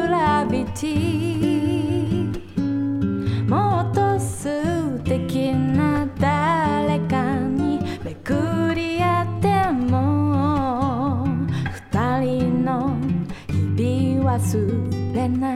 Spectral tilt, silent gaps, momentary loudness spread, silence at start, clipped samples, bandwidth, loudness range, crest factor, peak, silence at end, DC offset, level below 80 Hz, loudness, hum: -7 dB/octave; none; 5 LU; 0 s; under 0.1%; 14 kHz; 1 LU; 14 dB; -6 dBFS; 0 s; under 0.1%; -46 dBFS; -21 LUFS; none